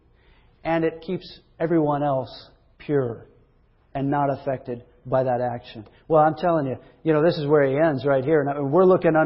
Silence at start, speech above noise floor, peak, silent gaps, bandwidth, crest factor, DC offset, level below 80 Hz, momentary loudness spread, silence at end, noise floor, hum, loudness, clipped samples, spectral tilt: 0.65 s; 38 dB; -6 dBFS; none; 5.8 kHz; 16 dB; under 0.1%; -56 dBFS; 17 LU; 0 s; -59 dBFS; none; -22 LUFS; under 0.1%; -12 dB/octave